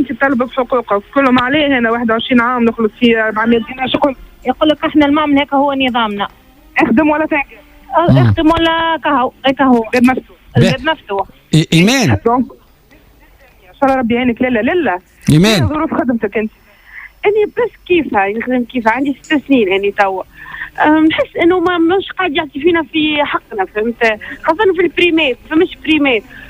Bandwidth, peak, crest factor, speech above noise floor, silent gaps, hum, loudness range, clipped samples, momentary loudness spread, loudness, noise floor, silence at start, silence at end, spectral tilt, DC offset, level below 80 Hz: 16 kHz; 0 dBFS; 14 dB; 33 dB; none; none; 2 LU; under 0.1%; 8 LU; -13 LUFS; -45 dBFS; 0 s; 0 s; -6 dB/octave; under 0.1%; -40 dBFS